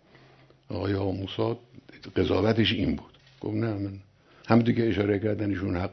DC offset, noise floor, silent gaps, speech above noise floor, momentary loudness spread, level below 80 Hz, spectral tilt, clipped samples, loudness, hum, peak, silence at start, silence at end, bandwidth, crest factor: under 0.1%; -56 dBFS; none; 30 dB; 14 LU; -52 dBFS; -8 dB/octave; under 0.1%; -27 LUFS; none; -4 dBFS; 0.7 s; 0 s; 6.2 kHz; 24 dB